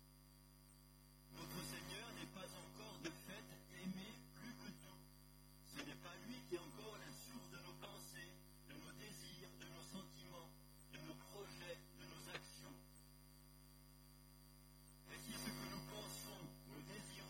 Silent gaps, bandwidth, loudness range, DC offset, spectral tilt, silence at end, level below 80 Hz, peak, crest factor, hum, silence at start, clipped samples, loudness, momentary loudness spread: none; 17.5 kHz; 4 LU; under 0.1%; -3.5 dB/octave; 0 s; -70 dBFS; -36 dBFS; 22 dB; 50 Hz at -65 dBFS; 0 s; under 0.1%; -55 LUFS; 14 LU